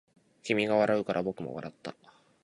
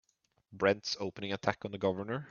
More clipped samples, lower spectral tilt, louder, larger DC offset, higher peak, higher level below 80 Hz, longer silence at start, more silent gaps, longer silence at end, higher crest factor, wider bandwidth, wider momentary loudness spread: neither; about the same, -6 dB/octave vs -5 dB/octave; first, -30 LUFS vs -34 LUFS; neither; about the same, -10 dBFS vs -10 dBFS; about the same, -68 dBFS vs -72 dBFS; about the same, 0.45 s vs 0.5 s; neither; first, 0.5 s vs 0 s; about the same, 20 dB vs 24 dB; first, 11 kHz vs 7.2 kHz; first, 18 LU vs 7 LU